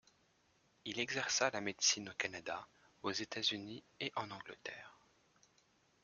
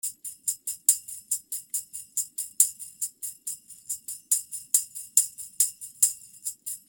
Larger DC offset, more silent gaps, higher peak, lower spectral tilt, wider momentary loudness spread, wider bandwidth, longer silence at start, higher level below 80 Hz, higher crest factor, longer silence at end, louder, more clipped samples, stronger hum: neither; neither; second, -18 dBFS vs -2 dBFS; first, -1 dB/octave vs 4 dB/octave; first, 16 LU vs 12 LU; second, 11.5 kHz vs over 20 kHz; first, 0.85 s vs 0.05 s; second, -80 dBFS vs -74 dBFS; second, 24 dB vs 30 dB; first, 1.1 s vs 0.1 s; second, -39 LUFS vs -27 LUFS; neither; neither